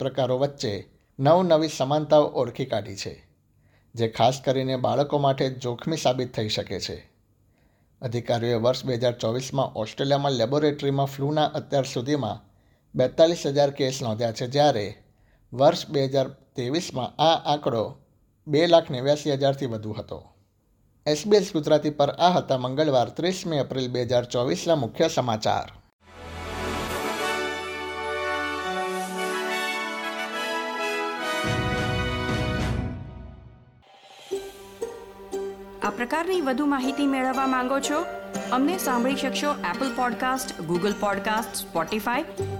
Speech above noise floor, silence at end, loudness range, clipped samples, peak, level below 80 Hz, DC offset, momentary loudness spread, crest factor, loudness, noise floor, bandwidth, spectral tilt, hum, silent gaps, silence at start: 40 dB; 0 s; 5 LU; under 0.1%; -4 dBFS; -50 dBFS; under 0.1%; 13 LU; 22 dB; -25 LUFS; -64 dBFS; 18 kHz; -5 dB/octave; none; 25.93-25.99 s; 0 s